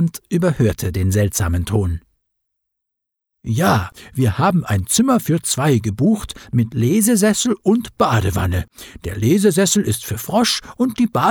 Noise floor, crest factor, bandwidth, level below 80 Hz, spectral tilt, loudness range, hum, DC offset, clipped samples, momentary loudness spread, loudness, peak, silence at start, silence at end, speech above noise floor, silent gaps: -80 dBFS; 14 dB; 20 kHz; -38 dBFS; -5 dB/octave; 4 LU; none; under 0.1%; under 0.1%; 8 LU; -17 LUFS; -2 dBFS; 0 s; 0 s; 63 dB; none